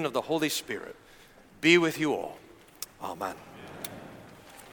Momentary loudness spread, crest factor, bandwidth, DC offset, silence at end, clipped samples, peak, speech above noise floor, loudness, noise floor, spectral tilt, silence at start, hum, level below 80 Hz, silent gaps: 26 LU; 24 dB; 19 kHz; under 0.1%; 0 s; under 0.1%; -6 dBFS; 22 dB; -28 LUFS; -50 dBFS; -4 dB/octave; 0 s; none; -66 dBFS; none